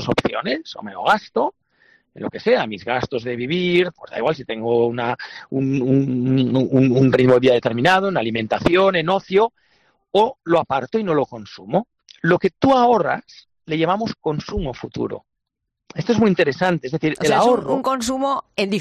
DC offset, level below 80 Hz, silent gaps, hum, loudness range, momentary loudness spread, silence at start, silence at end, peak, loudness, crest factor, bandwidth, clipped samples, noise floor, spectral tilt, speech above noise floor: under 0.1%; -48 dBFS; none; none; 6 LU; 12 LU; 0 s; 0 s; -4 dBFS; -19 LUFS; 16 dB; 13 kHz; under 0.1%; -79 dBFS; -6 dB/octave; 61 dB